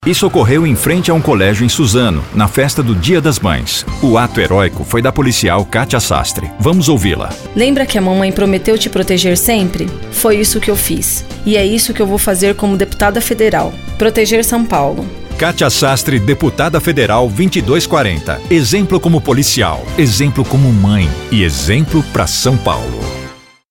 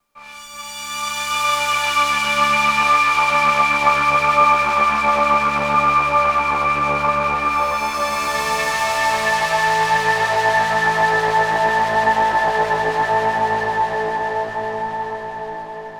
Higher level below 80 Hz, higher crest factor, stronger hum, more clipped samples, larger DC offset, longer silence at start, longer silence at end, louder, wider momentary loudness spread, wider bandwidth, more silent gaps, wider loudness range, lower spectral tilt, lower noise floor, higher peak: first, -28 dBFS vs -46 dBFS; second, 12 dB vs 18 dB; neither; neither; neither; second, 0 s vs 0.15 s; first, 0.35 s vs 0 s; first, -12 LUFS vs -17 LUFS; second, 5 LU vs 10 LU; second, 17 kHz vs over 20 kHz; neither; second, 1 LU vs 4 LU; first, -4.5 dB/octave vs -2.5 dB/octave; second, -32 dBFS vs -39 dBFS; about the same, 0 dBFS vs 0 dBFS